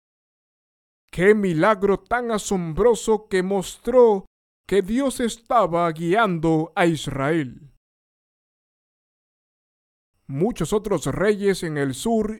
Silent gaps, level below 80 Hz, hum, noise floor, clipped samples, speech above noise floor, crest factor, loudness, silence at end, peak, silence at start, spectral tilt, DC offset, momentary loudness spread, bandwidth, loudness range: 4.27-4.64 s, 7.77-10.14 s; -46 dBFS; none; under -90 dBFS; under 0.1%; over 70 dB; 20 dB; -21 LUFS; 0 s; -4 dBFS; 1.15 s; -5.5 dB/octave; under 0.1%; 7 LU; 17 kHz; 10 LU